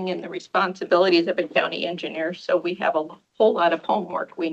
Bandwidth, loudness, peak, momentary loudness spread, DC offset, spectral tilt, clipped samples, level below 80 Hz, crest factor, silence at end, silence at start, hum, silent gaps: 8 kHz; -23 LUFS; -4 dBFS; 9 LU; under 0.1%; -5.5 dB/octave; under 0.1%; -74 dBFS; 18 dB; 0 s; 0 s; none; none